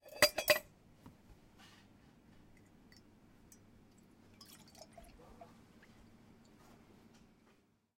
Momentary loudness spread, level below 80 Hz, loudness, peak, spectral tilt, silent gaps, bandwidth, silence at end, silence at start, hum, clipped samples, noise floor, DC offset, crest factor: 31 LU; -70 dBFS; -32 LUFS; -10 dBFS; -1 dB/octave; none; 16.5 kHz; 7.35 s; 0.15 s; none; under 0.1%; -71 dBFS; under 0.1%; 34 dB